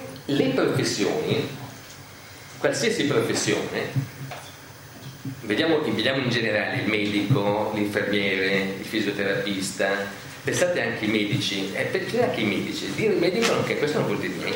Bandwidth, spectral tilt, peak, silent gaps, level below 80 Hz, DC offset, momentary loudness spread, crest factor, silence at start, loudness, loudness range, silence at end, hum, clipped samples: 16.5 kHz; -4.5 dB/octave; -6 dBFS; none; -60 dBFS; under 0.1%; 15 LU; 18 dB; 0 s; -24 LUFS; 3 LU; 0 s; none; under 0.1%